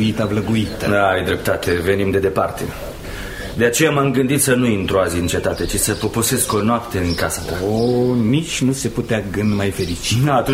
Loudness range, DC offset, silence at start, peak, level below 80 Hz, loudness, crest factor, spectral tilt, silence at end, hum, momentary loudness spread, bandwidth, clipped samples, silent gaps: 2 LU; under 0.1%; 0 s; -2 dBFS; -36 dBFS; -18 LUFS; 16 dB; -4.5 dB/octave; 0 s; none; 7 LU; 16 kHz; under 0.1%; none